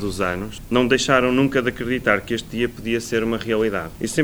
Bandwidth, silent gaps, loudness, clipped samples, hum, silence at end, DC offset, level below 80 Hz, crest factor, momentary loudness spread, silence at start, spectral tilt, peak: over 20 kHz; none; -21 LUFS; under 0.1%; none; 0 s; under 0.1%; -42 dBFS; 18 dB; 9 LU; 0 s; -4.5 dB/octave; -2 dBFS